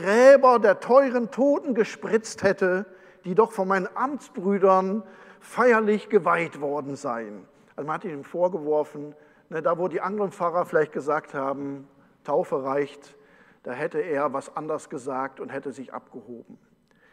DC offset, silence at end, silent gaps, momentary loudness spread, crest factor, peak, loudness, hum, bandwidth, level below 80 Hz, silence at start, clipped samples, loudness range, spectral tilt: under 0.1%; 0.55 s; none; 19 LU; 22 dB; -2 dBFS; -24 LUFS; none; 11.5 kHz; -72 dBFS; 0 s; under 0.1%; 7 LU; -6 dB/octave